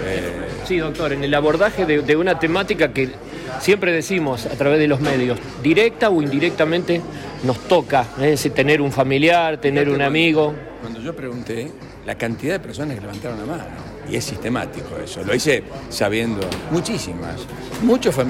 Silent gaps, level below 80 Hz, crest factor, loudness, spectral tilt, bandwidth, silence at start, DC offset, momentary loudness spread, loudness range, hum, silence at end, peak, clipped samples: none; -44 dBFS; 14 dB; -19 LUFS; -5.5 dB/octave; 16.5 kHz; 0 s; under 0.1%; 13 LU; 9 LU; none; 0 s; -6 dBFS; under 0.1%